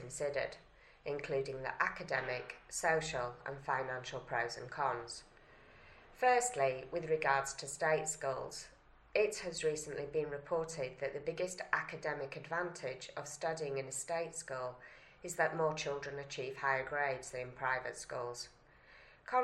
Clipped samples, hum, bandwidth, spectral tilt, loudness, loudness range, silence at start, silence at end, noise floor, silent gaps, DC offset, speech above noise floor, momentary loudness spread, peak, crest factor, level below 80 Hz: under 0.1%; none; 13 kHz; -3 dB/octave; -38 LUFS; 4 LU; 0 s; 0 s; -62 dBFS; none; under 0.1%; 24 dB; 11 LU; -16 dBFS; 24 dB; -66 dBFS